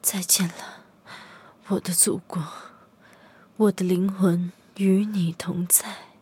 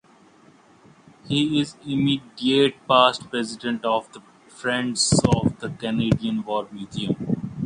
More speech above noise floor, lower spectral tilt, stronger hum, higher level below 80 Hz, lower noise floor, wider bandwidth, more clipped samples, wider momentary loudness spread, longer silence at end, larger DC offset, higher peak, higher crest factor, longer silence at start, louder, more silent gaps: about the same, 30 dB vs 31 dB; about the same, -4 dB/octave vs -4.5 dB/octave; neither; second, -70 dBFS vs -48 dBFS; about the same, -53 dBFS vs -53 dBFS; first, 16.5 kHz vs 10.5 kHz; neither; first, 21 LU vs 10 LU; first, 0.15 s vs 0 s; neither; about the same, -2 dBFS vs 0 dBFS; about the same, 24 dB vs 22 dB; second, 0.05 s vs 1.25 s; about the same, -23 LUFS vs -23 LUFS; neither